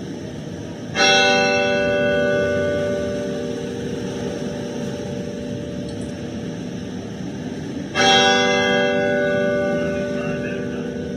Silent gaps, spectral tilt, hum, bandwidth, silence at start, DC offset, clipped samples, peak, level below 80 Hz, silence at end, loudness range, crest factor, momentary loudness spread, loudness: none; -4 dB/octave; none; 12 kHz; 0 s; under 0.1%; under 0.1%; -2 dBFS; -50 dBFS; 0 s; 10 LU; 18 dB; 15 LU; -20 LUFS